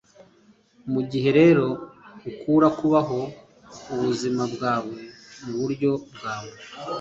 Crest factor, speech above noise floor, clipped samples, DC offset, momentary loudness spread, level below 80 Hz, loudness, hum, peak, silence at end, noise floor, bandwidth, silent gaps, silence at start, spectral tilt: 18 dB; 35 dB; under 0.1%; under 0.1%; 22 LU; -62 dBFS; -23 LUFS; none; -6 dBFS; 0 s; -57 dBFS; 7.8 kHz; none; 0.2 s; -7 dB/octave